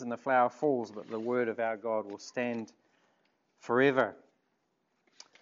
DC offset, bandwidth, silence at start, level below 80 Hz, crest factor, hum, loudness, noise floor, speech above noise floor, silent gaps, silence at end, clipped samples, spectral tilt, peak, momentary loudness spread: under 0.1%; 7.6 kHz; 0 s; -88 dBFS; 22 dB; none; -31 LUFS; -78 dBFS; 47 dB; none; 1.25 s; under 0.1%; -4 dB/octave; -12 dBFS; 13 LU